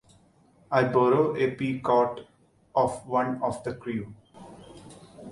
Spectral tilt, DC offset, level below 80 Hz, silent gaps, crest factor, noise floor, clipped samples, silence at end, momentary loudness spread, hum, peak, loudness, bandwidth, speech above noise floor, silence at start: -7 dB/octave; under 0.1%; -62 dBFS; none; 20 dB; -60 dBFS; under 0.1%; 0 s; 24 LU; none; -8 dBFS; -26 LUFS; 11.5 kHz; 35 dB; 0.7 s